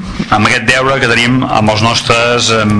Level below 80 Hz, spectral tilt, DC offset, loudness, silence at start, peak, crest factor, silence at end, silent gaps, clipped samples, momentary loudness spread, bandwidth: -32 dBFS; -4 dB/octave; under 0.1%; -9 LUFS; 0 s; 0 dBFS; 10 dB; 0 s; none; 0.3%; 2 LU; 11 kHz